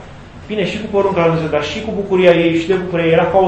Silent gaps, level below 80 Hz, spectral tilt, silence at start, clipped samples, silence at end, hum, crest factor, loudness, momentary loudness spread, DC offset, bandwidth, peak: none; -42 dBFS; -6.5 dB/octave; 0 s; 0.1%; 0 s; none; 14 dB; -15 LUFS; 9 LU; under 0.1%; 8.6 kHz; 0 dBFS